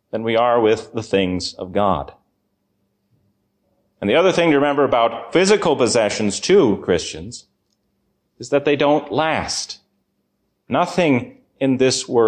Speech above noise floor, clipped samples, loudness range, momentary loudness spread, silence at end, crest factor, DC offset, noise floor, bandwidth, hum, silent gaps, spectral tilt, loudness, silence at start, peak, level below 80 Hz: 52 dB; under 0.1%; 6 LU; 12 LU; 0 s; 14 dB; under 0.1%; -70 dBFS; 10 kHz; none; none; -4.5 dB/octave; -18 LUFS; 0.15 s; -4 dBFS; -50 dBFS